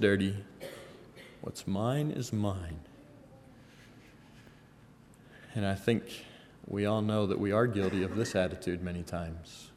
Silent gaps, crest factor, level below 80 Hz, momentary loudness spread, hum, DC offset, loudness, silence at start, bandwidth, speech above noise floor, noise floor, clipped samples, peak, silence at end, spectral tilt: none; 22 dB; -58 dBFS; 20 LU; none; under 0.1%; -33 LUFS; 0 s; 14.5 kHz; 26 dB; -57 dBFS; under 0.1%; -12 dBFS; 0.05 s; -6.5 dB/octave